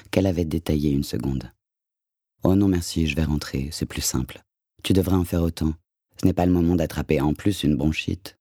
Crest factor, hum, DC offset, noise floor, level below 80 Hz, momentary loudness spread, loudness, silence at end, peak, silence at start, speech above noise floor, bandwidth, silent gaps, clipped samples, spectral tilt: 20 dB; none; under 0.1%; -87 dBFS; -38 dBFS; 9 LU; -23 LUFS; 0.1 s; -4 dBFS; 0.15 s; 65 dB; 18 kHz; none; under 0.1%; -6 dB/octave